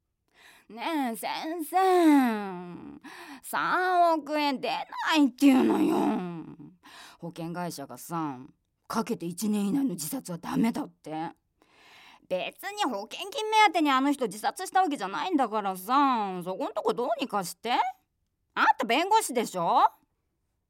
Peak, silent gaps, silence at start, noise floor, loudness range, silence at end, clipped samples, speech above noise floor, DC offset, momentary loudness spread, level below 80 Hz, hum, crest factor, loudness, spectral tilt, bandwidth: -10 dBFS; none; 0.7 s; -77 dBFS; 7 LU; 0.8 s; under 0.1%; 50 dB; under 0.1%; 16 LU; -74 dBFS; none; 18 dB; -27 LUFS; -4.5 dB/octave; 17 kHz